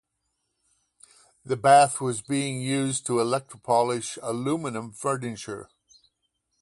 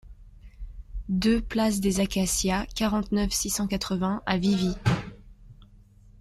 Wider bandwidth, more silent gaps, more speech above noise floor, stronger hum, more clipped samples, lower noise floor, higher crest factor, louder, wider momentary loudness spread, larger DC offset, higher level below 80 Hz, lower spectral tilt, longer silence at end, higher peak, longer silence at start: second, 11.5 kHz vs 14 kHz; neither; first, 53 dB vs 27 dB; neither; neither; first, -78 dBFS vs -53 dBFS; about the same, 22 dB vs 18 dB; about the same, -25 LUFS vs -26 LUFS; about the same, 15 LU vs 17 LU; neither; second, -68 dBFS vs -40 dBFS; about the same, -4.5 dB/octave vs -4.5 dB/octave; first, 1 s vs 0.45 s; first, -4 dBFS vs -8 dBFS; first, 1.45 s vs 0.05 s